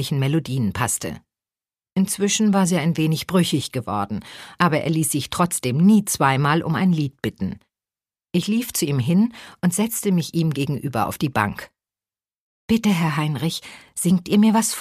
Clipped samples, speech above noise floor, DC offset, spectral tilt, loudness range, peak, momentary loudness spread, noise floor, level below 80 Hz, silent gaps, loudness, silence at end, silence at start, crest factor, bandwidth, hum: under 0.1%; over 70 dB; under 0.1%; -5 dB/octave; 4 LU; 0 dBFS; 10 LU; under -90 dBFS; -54 dBFS; 12.37-12.68 s; -21 LUFS; 0 s; 0 s; 20 dB; 15.5 kHz; none